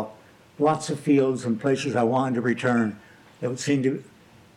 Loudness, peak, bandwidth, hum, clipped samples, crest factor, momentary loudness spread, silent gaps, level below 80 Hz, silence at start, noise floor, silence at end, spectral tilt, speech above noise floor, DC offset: -24 LUFS; -8 dBFS; 12 kHz; none; under 0.1%; 16 dB; 11 LU; none; -70 dBFS; 0 s; -49 dBFS; 0.55 s; -6 dB/octave; 26 dB; under 0.1%